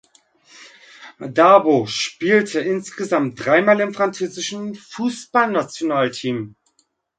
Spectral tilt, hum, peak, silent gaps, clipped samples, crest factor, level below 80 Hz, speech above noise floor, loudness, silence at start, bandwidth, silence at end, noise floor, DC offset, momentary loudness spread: -4.5 dB/octave; none; 0 dBFS; none; under 0.1%; 20 dB; -66 dBFS; 47 dB; -18 LUFS; 0.6 s; 9.4 kHz; 0.7 s; -65 dBFS; under 0.1%; 13 LU